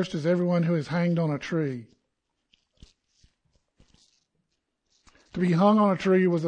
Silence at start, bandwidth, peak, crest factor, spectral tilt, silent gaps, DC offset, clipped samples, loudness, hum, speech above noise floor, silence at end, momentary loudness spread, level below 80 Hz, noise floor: 0 s; 9 kHz; -8 dBFS; 20 dB; -8 dB/octave; none; under 0.1%; under 0.1%; -24 LUFS; none; 55 dB; 0 s; 10 LU; -64 dBFS; -79 dBFS